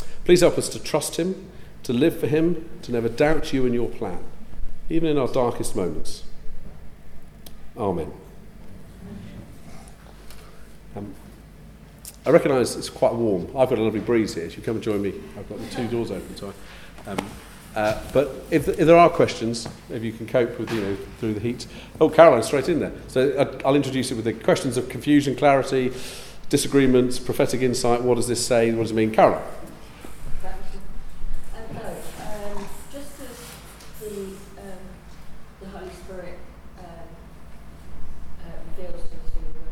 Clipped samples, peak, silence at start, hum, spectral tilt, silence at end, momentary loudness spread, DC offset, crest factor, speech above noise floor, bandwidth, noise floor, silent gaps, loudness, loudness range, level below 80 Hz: under 0.1%; 0 dBFS; 0 s; none; -5.5 dB/octave; 0 s; 24 LU; under 0.1%; 22 dB; 23 dB; 15.5 kHz; -44 dBFS; none; -22 LUFS; 20 LU; -38 dBFS